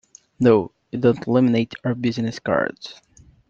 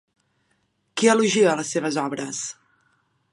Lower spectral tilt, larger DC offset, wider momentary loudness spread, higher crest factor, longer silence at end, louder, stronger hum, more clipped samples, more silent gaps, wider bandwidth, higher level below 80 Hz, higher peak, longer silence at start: first, -7.5 dB/octave vs -3.5 dB/octave; neither; about the same, 11 LU vs 13 LU; about the same, 18 dB vs 20 dB; second, 0.55 s vs 0.8 s; about the same, -21 LUFS vs -22 LUFS; neither; neither; neither; second, 7.6 kHz vs 11.5 kHz; first, -58 dBFS vs -76 dBFS; about the same, -2 dBFS vs -4 dBFS; second, 0.4 s vs 0.95 s